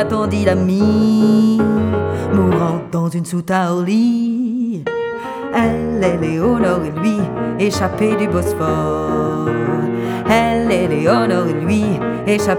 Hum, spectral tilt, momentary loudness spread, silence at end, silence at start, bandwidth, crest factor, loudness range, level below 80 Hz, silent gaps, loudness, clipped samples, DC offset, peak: none; -7 dB/octave; 6 LU; 0 s; 0 s; 15.5 kHz; 14 dB; 3 LU; -40 dBFS; none; -16 LUFS; under 0.1%; under 0.1%; 0 dBFS